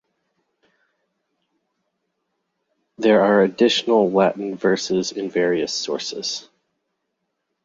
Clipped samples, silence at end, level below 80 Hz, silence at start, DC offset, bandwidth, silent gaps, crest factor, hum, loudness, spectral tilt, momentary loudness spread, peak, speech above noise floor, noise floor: under 0.1%; 1.25 s; -66 dBFS; 3 s; under 0.1%; 7.8 kHz; none; 18 dB; none; -19 LUFS; -4.5 dB/octave; 10 LU; -4 dBFS; 57 dB; -76 dBFS